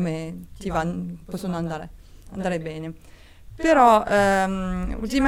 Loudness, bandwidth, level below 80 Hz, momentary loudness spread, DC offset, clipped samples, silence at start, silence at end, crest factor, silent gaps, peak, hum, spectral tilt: -23 LUFS; 16.5 kHz; -40 dBFS; 19 LU; under 0.1%; under 0.1%; 0 s; 0 s; 20 dB; none; -2 dBFS; none; -6 dB/octave